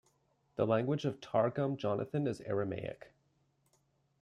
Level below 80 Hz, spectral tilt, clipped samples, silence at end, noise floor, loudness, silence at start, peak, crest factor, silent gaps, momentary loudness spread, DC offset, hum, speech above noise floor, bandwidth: -72 dBFS; -8 dB/octave; under 0.1%; 1.15 s; -75 dBFS; -35 LUFS; 0.6 s; -16 dBFS; 20 dB; none; 11 LU; under 0.1%; none; 41 dB; 11 kHz